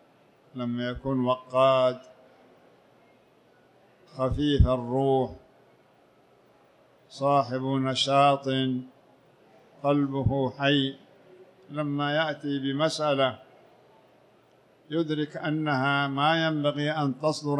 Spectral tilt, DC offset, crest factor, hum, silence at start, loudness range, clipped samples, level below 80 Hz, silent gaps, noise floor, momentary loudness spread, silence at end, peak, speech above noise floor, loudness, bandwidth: -6 dB/octave; under 0.1%; 20 dB; none; 0.55 s; 3 LU; under 0.1%; -42 dBFS; none; -60 dBFS; 10 LU; 0 s; -8 dBFS; 35 dB; -26 LUFS; 10.5 kHz